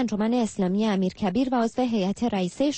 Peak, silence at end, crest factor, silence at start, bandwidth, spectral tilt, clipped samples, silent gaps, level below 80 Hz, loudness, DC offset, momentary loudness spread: -14 dBFS; 0 s; 10 dB; 0 s; 8.8 kHz; -6 dB/octave; under 0.1%; none; -56 dBFS; -25 LUFS; under 0.1%; 2 LU